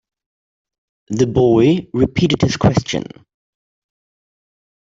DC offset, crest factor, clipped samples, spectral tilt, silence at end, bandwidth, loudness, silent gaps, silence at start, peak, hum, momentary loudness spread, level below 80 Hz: under 0.1%; 16 dB; under 0.1%; -6.5 dB/octave; 1.85 s; 7.8 kHz; -16 LUFS; none; 1.1 s; -2 dBFS; none; 12 LU; -44 dBFS